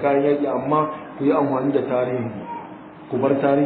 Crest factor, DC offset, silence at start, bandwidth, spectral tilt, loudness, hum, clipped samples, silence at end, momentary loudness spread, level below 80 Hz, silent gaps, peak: 16 dB; under 0.1%; 0 s; 4.3 kHz; -7 dB/octave; -21 LUFS; none; under 0.1%; 0 s; 14 LU; -62 dBFS; none; -6 dBFS